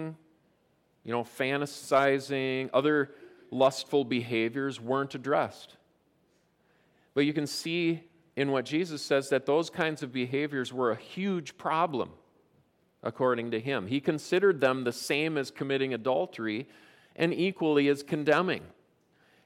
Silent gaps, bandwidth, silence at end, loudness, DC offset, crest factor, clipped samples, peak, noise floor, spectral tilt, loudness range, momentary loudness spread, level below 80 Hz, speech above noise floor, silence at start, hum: none; 16 kHz; 0.75 s; -29 LUFS; under 0.1%; 18 dB; under 0.1%; -12 dBFS; -70 dBFS; -5.5 dB/octave; 4 LU; 9 LU; -78 dBFS; 41 dB; 0 s; none